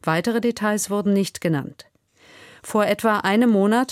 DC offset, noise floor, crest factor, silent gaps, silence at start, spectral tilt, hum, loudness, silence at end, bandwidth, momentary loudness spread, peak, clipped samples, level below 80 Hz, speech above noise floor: under 0.1%; -52 dBFS; 16 dB; none; 0.05 s; -5 dB/octave; none; -21 LUFS; 0 s; 15.5 kHz; 8 LU; -6 dBFS; under 0.1%; -64 dBFS; 32 dB